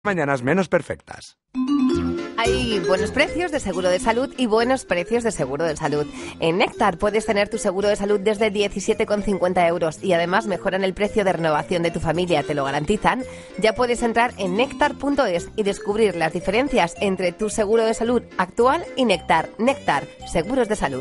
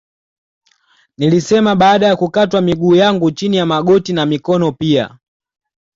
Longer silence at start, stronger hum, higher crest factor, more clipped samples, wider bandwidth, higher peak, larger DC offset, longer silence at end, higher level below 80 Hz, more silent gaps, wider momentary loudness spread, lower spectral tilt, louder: second, 0.05 s vs 1.2 s; neither; first, 18 dB vs 12 dB; neither; first, 11.5 kHz vs 7.8 kHz; about the same, -2 dBFS vs -2 dBFS; neither; second, 0 s vs 0.85 s; first, -42 dBFS vs -50 dBFS; neither; about the same, 5 LU vs 6 LU; about the same, -5 dB/octave vs -6 dB/octave; second, -21 LUFS vs -13 LUFS